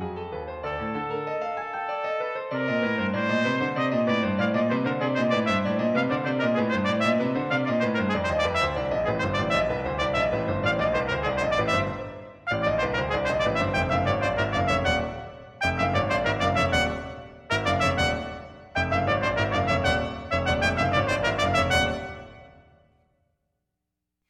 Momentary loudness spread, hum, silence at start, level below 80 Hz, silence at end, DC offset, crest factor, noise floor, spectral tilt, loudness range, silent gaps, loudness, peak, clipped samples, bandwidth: 8 LU; none; 0 s; -44 dBFS; 1.8 s; under 0.1%; 18 dB; -83 dBFS; -5.5 dB/octave; 2 LU; none; -25 LUFS; -8 dBFS; under 0.1%; 13.5 kHz